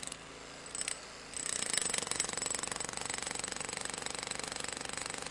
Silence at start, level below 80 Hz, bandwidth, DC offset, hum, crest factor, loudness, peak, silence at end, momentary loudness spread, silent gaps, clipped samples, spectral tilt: 0 s; -64 dBFS; 11.5 kHz; under 0.1%; none; 26 dB; -36 LUFS; -14 dBFS; 0 s; 11 LU; none; under 0.1%; -0.5 dB/octave